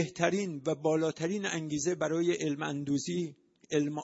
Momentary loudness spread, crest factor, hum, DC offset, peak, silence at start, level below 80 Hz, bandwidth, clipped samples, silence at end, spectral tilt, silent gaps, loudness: 5 LU; 20 dB; none; under 0.1%; -12 dBFS; 0 s; -72 dBFS; 8 kHz; under 0.1%; 0 s; -5 dB/octave; none; -32 LUFS